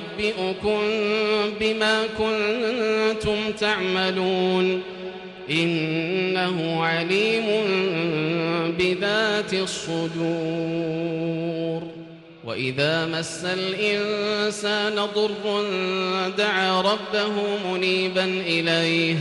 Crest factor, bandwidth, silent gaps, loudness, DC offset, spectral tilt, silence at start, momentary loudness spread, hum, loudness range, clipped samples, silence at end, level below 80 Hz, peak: 14 dB; 11.5 kHz; none; -23 LUFS; under 0.1%; -4.5 dB/octave; 0 s; 6 LU; none; 4 LU; under 0.1%; 0 s; -56 dBFS; -10 dBFS